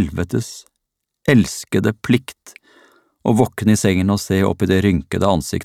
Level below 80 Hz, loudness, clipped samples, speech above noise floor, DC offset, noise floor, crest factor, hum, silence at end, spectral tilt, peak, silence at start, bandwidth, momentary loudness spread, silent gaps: -44 dBFS; -18 LUFS; under 0.1%; 60 dB; under 0.1%; -77 dBFS; 18 dB; none; 0 s; -6 dB/octave; 0 dBFS; 0 s; 16 kHz; 9 LU; none